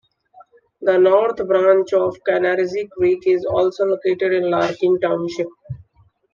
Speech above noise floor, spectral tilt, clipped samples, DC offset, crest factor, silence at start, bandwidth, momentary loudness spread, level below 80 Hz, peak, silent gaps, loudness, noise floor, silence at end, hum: 40 dB; -6.5 dB/octave; under 0.1%; under 0.1%; 16 dB; 0.8 s; 7.2 kHz; 10 LU; -58 dBFS; -2 dBFS; none; -18 LUFS; -57 dBFS; 0.55 s; none